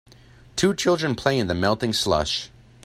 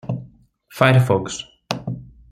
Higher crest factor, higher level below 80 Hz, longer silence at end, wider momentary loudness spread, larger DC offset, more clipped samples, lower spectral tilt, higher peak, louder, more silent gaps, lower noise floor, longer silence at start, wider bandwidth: about the same, 20 dB vs 18 dB; about the same, -48 dBFS vs -52 dBFS; about the same, 0.35 s vs 0.25 s; second, 7 LU vs 18 LU; neither; neither; second, -4.5 dB/octave vs -6 dB/octave; about the same, -4 dBFS vs -2 dBFS; second, -23 LUFS vs -19 LUFS; neither; about the same, -50 dBFS vs -49 dBFS; first, 0.55 s vs 0.05 s; about the same, 15.5 kHz vs 14.5 kHz